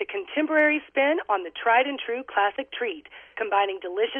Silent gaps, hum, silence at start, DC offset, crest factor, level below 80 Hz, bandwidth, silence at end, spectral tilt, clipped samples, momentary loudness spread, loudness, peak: none; none; 0 s; under 0.1%; 16 dB; -70 dBFS; 3.8 kHz; 0 s; -5 dB/octave; under 0.1%; 10 LU; -24 LUFS; -8 dBFS